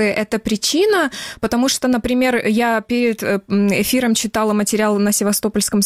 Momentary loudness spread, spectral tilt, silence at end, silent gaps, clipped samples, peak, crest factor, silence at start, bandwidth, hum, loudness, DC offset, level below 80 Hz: 4 LU; -3.5 dB/octave; 0 s; none; under 0.1%; -6 dBFS; 10 dB; 0 s; 16.5 kHz; none; -17 LUFS; under 0.1%; -46 dBFS